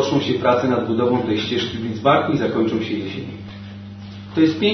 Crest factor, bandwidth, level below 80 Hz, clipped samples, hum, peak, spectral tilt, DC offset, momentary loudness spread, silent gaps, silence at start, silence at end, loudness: 18 dB; 6.4 kHz; -54 dBFS; under 0.1%; none; -2 dBFS; -6.5 dB/octave; under 0.1%; 18 LU; none; 0 s; 0 s; -20 LUFS